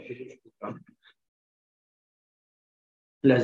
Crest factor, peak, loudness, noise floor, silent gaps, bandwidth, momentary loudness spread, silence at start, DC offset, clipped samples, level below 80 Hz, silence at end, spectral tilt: 24 dB; -8 dBFS; -30 LUFS; -59 dBFS; 1.28-3.21 s; 4.4 kHz; 22 LU; 0.05 s; under 0.1%; under 0.1%; -70 dBFS; 0 s; -8.5 dB/octave